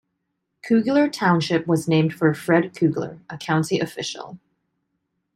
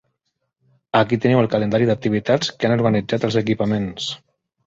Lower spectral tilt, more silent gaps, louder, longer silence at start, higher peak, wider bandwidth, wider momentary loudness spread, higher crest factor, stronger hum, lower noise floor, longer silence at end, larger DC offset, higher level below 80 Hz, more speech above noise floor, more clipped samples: about the same, -6 dB/octave vs -6.5 dB/octave; neither; about the same, -21 LUFS vs -19 LUFS; second, 0.65 s vs 0.95 s; about the same, -4 dBFS vs -2 dBFS; first, 14 kHz vs 7.8 kHz; first, 14 LU vs 7 LU; about the same, 18 dB vs 18 dB; neither; about the same, -76 dBFS vs -75 dBFS; first, 1 s vs 0.5 s; neither; second, -64 dBFS vs -52 dBFS; about the same, 56 dB vs 56 dB; neither